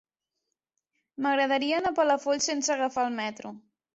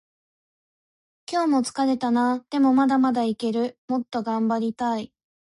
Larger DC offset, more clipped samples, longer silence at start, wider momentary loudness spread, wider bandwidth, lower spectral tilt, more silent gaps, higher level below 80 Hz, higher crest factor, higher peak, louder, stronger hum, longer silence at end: neither; neither; about the same, 1.2 s vs 1.3 s; first, 13 LU vs 8 LU; second, 8.2 kHz vs 11.5 kHz; second, -2 dB/octave vs -5 dB/octave; second, none vs 3.78-3.88 s; about the same, -70 dBFS vs -70 dBFS; first, 18 dB vs 12 dB; about the same, -12 dBFS vs -12 dBFS; second, -27 LUFS vs -23 LUFS; neither; second, 0.35 s vs 0.5 s